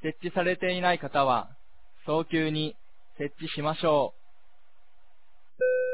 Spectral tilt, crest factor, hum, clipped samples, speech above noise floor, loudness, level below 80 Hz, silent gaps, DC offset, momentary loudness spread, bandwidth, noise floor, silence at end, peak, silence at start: -9.5 dB/octave; 20 dB; none; under 0.1%; 39 dB; -28 LUFS; -66 dBFS; none; 0.8%; 10 LU; 4 kHz; -67 dBFS; 0 s; -10 dBFS; 0.05 s